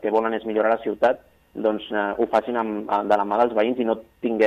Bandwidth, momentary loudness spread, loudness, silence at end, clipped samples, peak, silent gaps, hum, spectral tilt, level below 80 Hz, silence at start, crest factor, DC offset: 13 kHz; 5 LU; -23 LUFS; 0 s; under 0.1%; -6 dBFS; none; none; -6.5 dB/octave; -60 dBFS; 0 s; 18 dB; under 0.1%